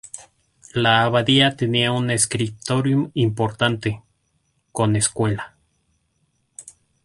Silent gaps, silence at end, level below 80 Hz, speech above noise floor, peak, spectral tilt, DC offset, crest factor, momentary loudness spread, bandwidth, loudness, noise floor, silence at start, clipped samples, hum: none; 0.35 s; -52 dBFS; 48 dB; -2 dBFS; -4 dB/octave; under 0.1%; 20 dB; 22 LU; 11.5 kHz; -20 LUFS; -68 dBFS; 0.15 s; under 0.1%; none